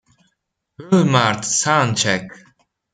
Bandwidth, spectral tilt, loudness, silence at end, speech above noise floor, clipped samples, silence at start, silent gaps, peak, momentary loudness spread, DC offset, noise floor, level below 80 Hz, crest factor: 9.6 kHz; -4 dB/octave; -17 LUFS; 0.6 s; 56 dB; under 0.1%; 0.8 s; none; -2 dBFS; 6 LU; under 0.1%; -73 dBFS; -58 dBFS; 18 dB